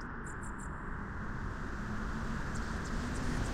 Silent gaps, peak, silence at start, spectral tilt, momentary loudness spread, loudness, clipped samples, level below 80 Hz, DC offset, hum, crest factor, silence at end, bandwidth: none; -22 dBFS; 0 s; -5.5 dB/octave; 5 LU; -40 LUFS; under 0.1%; -42 dBFS; under 0.1%; none; 16 dB; 0 s; 14 kHz